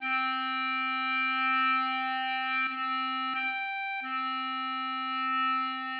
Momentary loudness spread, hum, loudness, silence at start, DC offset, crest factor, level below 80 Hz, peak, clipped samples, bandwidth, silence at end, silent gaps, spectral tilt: 6 LU; none; -29 LUFS; 0 s; under 0.1%; 12 dB; under -90 dBFS; -18 dBFS; under 0.1%; 5.6 kHz; 0 s; none; -3 dB/octave